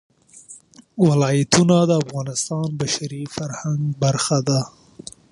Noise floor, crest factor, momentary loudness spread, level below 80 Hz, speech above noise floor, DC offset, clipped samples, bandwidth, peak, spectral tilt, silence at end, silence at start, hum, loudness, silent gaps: -45 dBFS; 20 dB; 22 LU; -56 dBFS; 26 dB; under 0.1%; under 0.1%; 11.5 kHz; 0 dBFS; -5 dB/octave; 0.65 s; 0.35 s; none; -20 LUFS; none